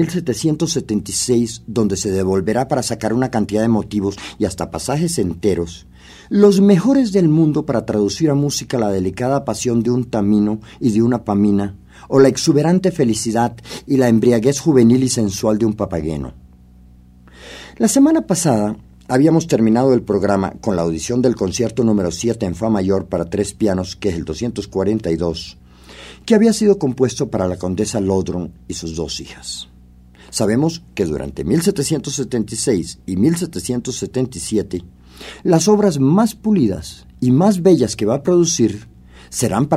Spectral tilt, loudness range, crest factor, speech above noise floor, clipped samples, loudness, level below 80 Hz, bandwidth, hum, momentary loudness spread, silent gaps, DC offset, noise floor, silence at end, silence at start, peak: -6 dB/octave; 5 LU; 16 dB; 28 dB; under 0.1%; -17 LUFS; -44 dBFS; 15.5 kHz; none; 11 LU; none; under 0.1%; -44 dBFS; 0 s; 0 s; 0 dBFS